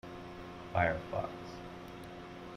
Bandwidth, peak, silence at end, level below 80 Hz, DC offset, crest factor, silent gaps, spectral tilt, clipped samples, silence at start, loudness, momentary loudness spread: 15.5 kHz; -16 dBFS; 0 s; -58 dBFS; under 0.1%; 22 dB; none; -6.5 dB/octave; under 0.1%; 0.05 s; -39 LUFS; 15 LU